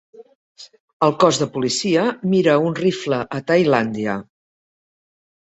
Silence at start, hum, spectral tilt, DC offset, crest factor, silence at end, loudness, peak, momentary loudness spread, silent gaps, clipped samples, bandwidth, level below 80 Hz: 0.15 s; none; -5 dB/octave; under 0.1%; 18 dB; 1.2 s; -19 LUFS; -2 dBFS; 7 LU; 0.35-0.55 s, 0.80-1.00 s; under 0.1%; 8.2 kHz; -60 dBFS